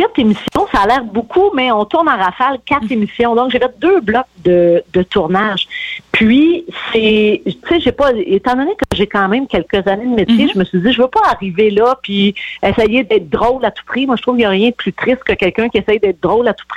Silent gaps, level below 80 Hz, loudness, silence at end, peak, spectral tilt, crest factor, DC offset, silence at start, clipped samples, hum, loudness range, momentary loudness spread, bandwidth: none; -40 dBFS; -13 LUFS; 0 s; 0 dBFS; -6.5 dB/octave; 12 dB; under 0.1%; 0 s; under 0.1%; none; 1 LU; 5 LU; 11.5 kHz